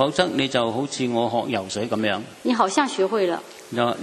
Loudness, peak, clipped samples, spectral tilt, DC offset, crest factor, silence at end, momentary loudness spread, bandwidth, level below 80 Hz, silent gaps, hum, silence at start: -23 LUFS; -2 dBFS; under 0.1%; -4.5 dB/octave; under 0.1%; 20 dB; 0 s; 6 LU; 13.5 kHz; -62 dBFS; none; none; 0 s